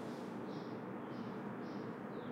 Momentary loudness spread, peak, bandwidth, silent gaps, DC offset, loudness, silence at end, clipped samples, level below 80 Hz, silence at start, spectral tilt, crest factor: 1 LU; -34 dBFS; 16 kHz; none; under 0.1%; -46 LUFS; 0 s; under 0.1%; -82 dBFS; 0 s; -7.5 dB/octave; 12 dB